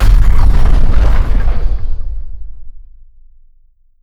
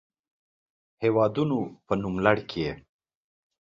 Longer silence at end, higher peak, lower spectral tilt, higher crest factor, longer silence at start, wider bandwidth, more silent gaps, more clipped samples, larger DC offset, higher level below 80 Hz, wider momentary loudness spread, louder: first, 1.25 s vs 0.8 s; first, 0 dBFS vs -4 dBFS; about the same, -7 dB/octave vs -8 dB/octave; second, 8 dB vs 24 dB; second, 0 s vs 1 s; second, 5.6 kHz vs 7.4 kHz; neither; first, 1% vs under 0.1%; neither; first, -10 dBFS vs -56 dBFS; first, 19 LU vs 8 LU; first, -16 LUFS vs -26 LUFS